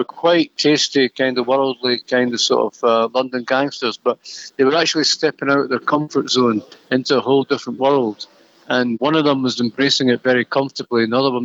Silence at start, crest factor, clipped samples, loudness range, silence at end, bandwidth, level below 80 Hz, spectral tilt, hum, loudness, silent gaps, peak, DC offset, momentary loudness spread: 0 s; 14 dB; under 0.1%; 2 LU; 0 s; 8 kHz; -76 dBFS; -4 dB/octave; none; -17 LUFS; none; -4 dBFS; under 0.1%; 6 LU